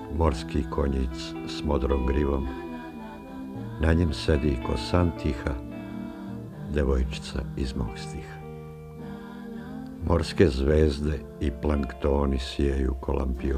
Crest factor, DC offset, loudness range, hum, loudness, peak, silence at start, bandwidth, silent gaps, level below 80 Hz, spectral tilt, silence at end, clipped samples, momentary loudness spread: 22 dB; under 0.1%; 6 LU; none; -28 LUFS; -6 dBFS; 0 s; 10 kHz; none; -32 dBFS; -7 dB/octave; 0 s; under 0.1%; 16 LU